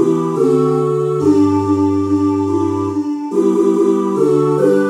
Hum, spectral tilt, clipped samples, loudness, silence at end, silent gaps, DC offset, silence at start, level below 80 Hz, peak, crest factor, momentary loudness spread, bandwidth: none; -8 dB/octave; under 0.1%; -15 LUFS; 0 s; none; under 0.1%; 0 s; -62 dBFS; 0 dBFS; 14 dB; 4 LU; 11.5 kHz